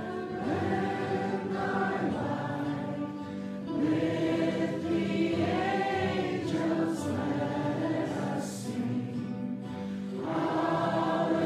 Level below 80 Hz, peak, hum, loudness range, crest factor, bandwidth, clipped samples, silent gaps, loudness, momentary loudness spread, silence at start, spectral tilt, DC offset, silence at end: -66 dBFS; -16 dBFS; none; 3 LU; 14 dB; 13.5 kHz; under 0.1%; none; -31 LUFS; 7 LU; 0 s; -6.5 dB/octave; under 0.1%; 0 s